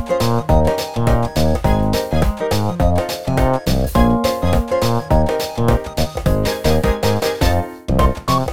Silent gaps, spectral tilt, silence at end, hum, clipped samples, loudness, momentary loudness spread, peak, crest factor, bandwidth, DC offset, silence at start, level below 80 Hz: none; -6 dB/octave; 0 s; none; under 0.1%; -17 LUFS; 4 LU; -2 dBFS; 14 dB; 17.5 kHz; 3%; 0 s; -24 dBFS